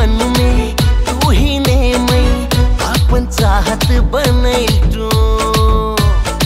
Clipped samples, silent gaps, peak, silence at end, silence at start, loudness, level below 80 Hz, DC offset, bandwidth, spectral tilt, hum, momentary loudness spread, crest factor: under 0.1%; none; 0 dBFS; 0 s; 0 s; -13 LUFS; -14 dBFS; under 0.1%; 16 kHz; -5 dB/octave; none; 2 LU; 10 dB